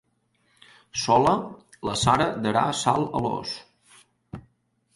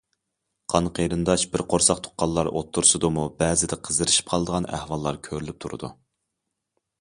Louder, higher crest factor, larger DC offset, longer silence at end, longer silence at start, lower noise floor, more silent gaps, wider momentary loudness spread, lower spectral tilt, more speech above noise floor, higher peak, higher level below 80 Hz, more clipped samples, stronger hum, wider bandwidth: about the same, -24 LUFS vs -23 LUFS; about the same, 20 dB vs 24 dB; neither; second, 0.55 s vs 1.1 s; first, 0.95 s vs 0.7 s; second, -69 dBFS vs -81 dBFS; neither; first, 22 LU vs 15 LU; about the same, -4.5 dB/octave vs -3.5 dB/octave; second, 45 dB vs 57 dB; second, -6 dBFS vs -2 dBFS; second, -52 dBFS vs -46 dBFS; neither; neither; about the same, 11.5 kHz vs 11.5 kHz